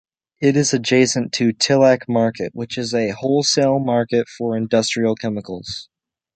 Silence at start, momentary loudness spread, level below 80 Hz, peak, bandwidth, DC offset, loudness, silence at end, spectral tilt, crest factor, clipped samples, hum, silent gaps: 0.4 s; 11 LU; -58 dBFS; -2 dBFS; 9.2 kHz; under 0.1%; -18 LUFS; 0.5 s; -4.5 dB/octave; 18 dB; under 0.1%; none; none